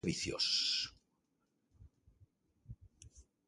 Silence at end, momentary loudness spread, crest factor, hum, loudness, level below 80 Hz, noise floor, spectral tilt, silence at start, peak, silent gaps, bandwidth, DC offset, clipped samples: 0.25 s; 26 LU; 22 dB; none; -34 LUFS; -64 dBFS; -82 dBFS; -2.5 dB/octave; 0.05 s; -20 dBFS; none; 11.5 kHz; under 0.1%; under 0.1%